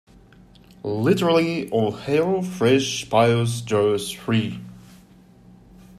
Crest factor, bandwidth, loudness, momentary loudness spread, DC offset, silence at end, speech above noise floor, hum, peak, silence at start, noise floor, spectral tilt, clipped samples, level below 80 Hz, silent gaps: 18 dB; 14.5 kHz; -21 LUFS; 11 LU; under 0.1%; 1.2 s; 29 dB; none; -4 dBFS; 0.85 s; -50 dBFS; -5.5 dB/octave; under 0.1%; -56 dBFS; none